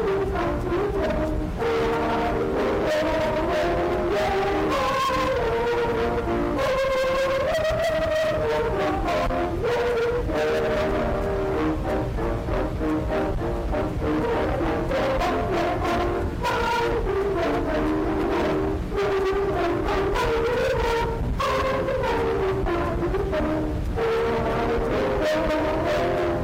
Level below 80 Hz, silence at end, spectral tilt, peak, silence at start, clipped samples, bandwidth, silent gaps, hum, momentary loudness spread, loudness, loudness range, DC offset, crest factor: -34 dBFS; 0 s; -6 dB/octave; -16 dBFS; 0 s; under 0.1%; 16 kHz; none; none; 3 LU; -24 LUFS; 2 LU; under 0.1%; 8 dB